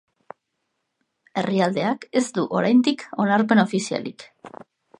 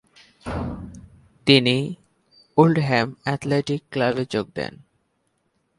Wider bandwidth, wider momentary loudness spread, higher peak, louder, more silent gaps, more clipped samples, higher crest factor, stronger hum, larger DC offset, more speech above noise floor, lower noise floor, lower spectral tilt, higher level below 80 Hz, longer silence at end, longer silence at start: about the same, 11 kHz vs 11.5 kHz; second, 13 LU vs 17 LU; about the same, -2 dBFS vs 0 dBFS; about the same, -21 LUFS vs -22 LUFS; neither; neither; about the same, 20 dB vs 22 dB; neither; neither; first, 55 dB vs 49 dB; first, -77 dBFS vs -70 dBFS; about the same, -5.5 dB/octave vs -6 dB/octave; second, -72 dBFS vs -48 dBFS; second, 0.5 s vs 1.05 s; first, 1.35 s vs 0.45 s